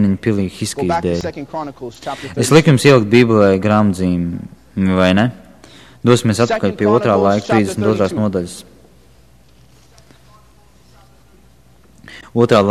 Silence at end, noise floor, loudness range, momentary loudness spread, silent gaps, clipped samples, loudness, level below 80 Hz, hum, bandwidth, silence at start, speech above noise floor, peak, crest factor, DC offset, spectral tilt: 0 s; -49 dBFS; 9 LU; 16 LU; none; under 0.1%; -15 LUFS; -46 dBFS; none; 14 kHz; 0 s; 35 dB; 0 dBFS; 16 dB; 0.3%; -6 dB/octave